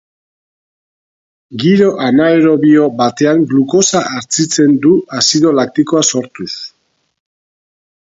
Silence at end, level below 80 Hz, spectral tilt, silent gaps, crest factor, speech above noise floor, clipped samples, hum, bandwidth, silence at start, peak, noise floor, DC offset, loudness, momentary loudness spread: 1.45 s; -56 dBFS; -4 dB/octave; none; 12 dB; 50 dB; under 0.1%; none; 8 kHz; 1.5 s; 0 dBFS; -61 dBFS; under 0.1%; -11 LUFS; 12 LU